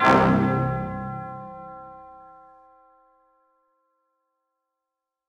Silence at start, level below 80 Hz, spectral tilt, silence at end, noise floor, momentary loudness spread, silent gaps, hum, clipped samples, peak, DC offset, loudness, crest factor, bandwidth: 0 s; -50 dBFS; -7.5 dB/octave; 3.1 s; -85 dBFS; 26 LU; none; none; under 0.1%; -6 dBFS; under 0.1%; -23 LUFS; 22 dB; 10 kHz